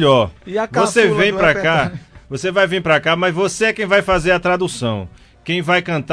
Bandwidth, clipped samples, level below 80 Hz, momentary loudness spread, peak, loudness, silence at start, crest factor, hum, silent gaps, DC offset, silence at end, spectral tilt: 11 kHz; under 0.1%; -40 dBFS; 10 LU; -2 dBFS; -16 LUFS; 0 s; 14 dB; none; none; under 0.1%; 0 s; -4.5 dB/octave